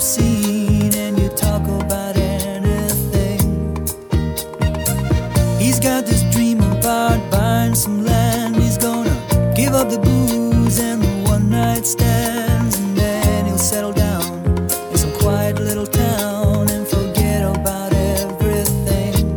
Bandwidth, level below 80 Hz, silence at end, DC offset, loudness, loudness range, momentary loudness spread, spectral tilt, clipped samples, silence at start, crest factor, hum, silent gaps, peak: 19.5 kHz; -26 dBFS; 0 s; under 0.1%; -17 LUFS; 3 LU; 4 LU; -5.5 dB/octave; under 0.1%; 0 s; 14 dB; none; none; -2 dBFS